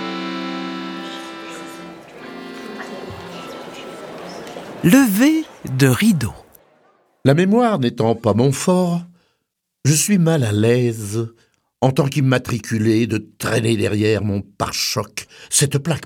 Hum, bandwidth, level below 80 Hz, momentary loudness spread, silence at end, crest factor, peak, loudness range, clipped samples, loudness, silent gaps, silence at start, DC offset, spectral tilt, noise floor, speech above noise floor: none; 20 kHz; -52 dBFS; 18 LU; 0 s; 18 dB; 0 dBFS; 13 LU; under 0.1%; -18 LUFS; none; 0 s; under 0.1%; -5 dB/octave; -75 dBFS; 58 dB